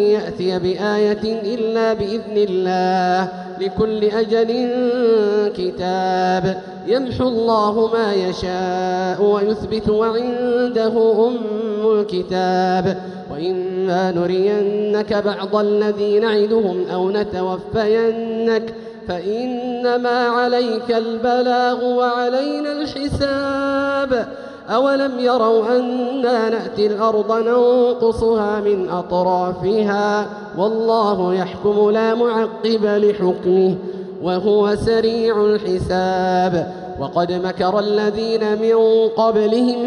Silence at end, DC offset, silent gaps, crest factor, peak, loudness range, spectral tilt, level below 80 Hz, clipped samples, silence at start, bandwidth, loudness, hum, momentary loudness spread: 0 s; under 0.1%; none; 12 dB; -6 dBFS; 2 LU; -6.5 dB/octave; -46 dBFS; under 0.1%; 0 s; 10 kHz; -18 LUFS; none; 7 LU